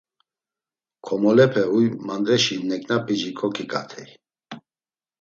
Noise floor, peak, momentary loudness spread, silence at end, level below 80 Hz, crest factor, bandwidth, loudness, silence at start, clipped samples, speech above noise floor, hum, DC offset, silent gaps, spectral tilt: under -90 dBFS; -4 dBFS; 25 LU; 0.65 s; -68 dBFS; 20 dB; 7.8 kHz; -21 LUFS; 1.05 s; under 0.1%; over 69 dB; none; under 0.1%; none; -5 dB/octave